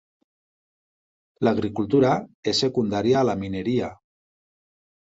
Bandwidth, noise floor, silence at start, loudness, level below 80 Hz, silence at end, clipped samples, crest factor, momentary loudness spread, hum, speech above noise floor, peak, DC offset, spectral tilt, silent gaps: 8 kHz; under -90 dBFS; 1.4 s; -23 LUFS; -56 dBFS; 1.1 s; under 0.1%; 18 dB; 6 LU; none; over 68 dB; -8 dBFS; under 0.1%; -6 dB/octave; 2.34-2.43 s